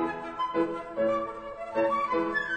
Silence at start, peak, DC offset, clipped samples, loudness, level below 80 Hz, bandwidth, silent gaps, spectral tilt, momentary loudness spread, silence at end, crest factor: 0 s; -14 dBFS; under 0.1%; under 0.1%; -30 LUFS; -60 dBFS; 9 kHz; none; -6 dB/octave; 6 LU; 0 s; 14 dB